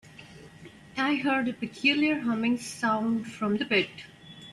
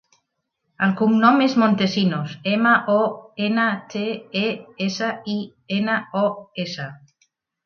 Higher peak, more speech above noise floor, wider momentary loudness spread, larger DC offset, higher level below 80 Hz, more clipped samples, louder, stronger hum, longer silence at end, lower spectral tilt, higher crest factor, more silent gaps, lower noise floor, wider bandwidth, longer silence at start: second, -12 dBFS vs -2 dBFS; second, 22 dB vs 55 dB; first, 22 LU vs 12 LU; neither; about the same, -68 dBFS vs -68 dBFS; neither; second, -27 LUFS vs -21 LUFS; neither; second, 0 s vs 0.7 s; second, -4.5 dB/octave vs -6 dB/octave; about the same, 18 dB vs 20 dB; neither; second, -49 dBFS vs -76 dBFS; first, 12 kHz vs 6.8 kHz; second, 0.2 s vs 0.8 s